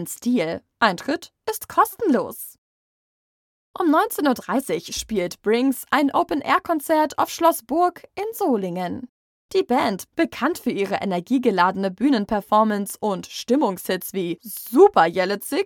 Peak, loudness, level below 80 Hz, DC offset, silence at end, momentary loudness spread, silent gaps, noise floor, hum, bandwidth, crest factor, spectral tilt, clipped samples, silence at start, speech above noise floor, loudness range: -2 dBFS; -22 LUFS; -58 dBFS; under 0.1%; 0 s; 9 LU; 2.58-3.74 s, 9.09-9.49 s; under -90 dBFS; none; 19.5 kHz; 20 dB; -4.5 dB/octave; under 0.1%; 0 s; over 69 dB; 4 LU